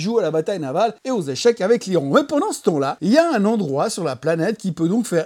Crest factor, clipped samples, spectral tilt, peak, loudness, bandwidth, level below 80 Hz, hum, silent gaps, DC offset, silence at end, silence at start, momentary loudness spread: 18 dB; under 0.1%; -5.5 dB/octave; -2 dBFS; -19 LUFS; 16.5 kHz; -68 dBFS; none; none; under 0.1%; 0 s; 0 s; 6 LU